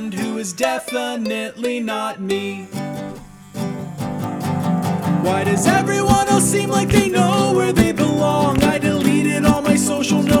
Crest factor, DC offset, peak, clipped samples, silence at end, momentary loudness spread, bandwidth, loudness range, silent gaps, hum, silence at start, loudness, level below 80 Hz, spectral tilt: 16 dB; under 0.1%; -2 dBFS; under 0.1%; 0 s; 11 LU; 19.5 kHz; 9 LU; none; none; 0 s; -18 LUFS; -38 dBFS; -5 dB/octave